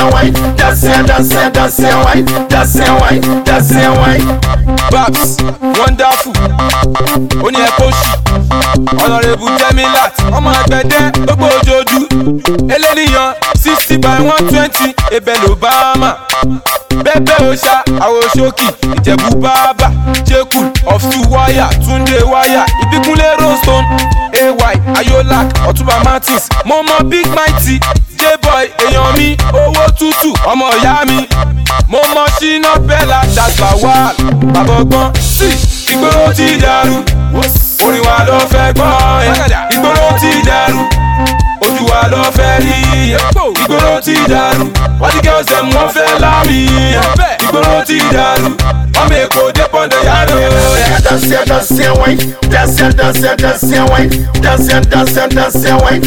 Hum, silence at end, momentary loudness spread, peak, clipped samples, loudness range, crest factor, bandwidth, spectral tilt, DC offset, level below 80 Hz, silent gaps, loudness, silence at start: none; 0 s; 3 LU; 0 dBFS; under 0.1%; 1 LU; 8 dB; 18 kHz; -4.5 dB/octave; under 0.1%; -16 dBFS; none; -8 LUFS; 0 s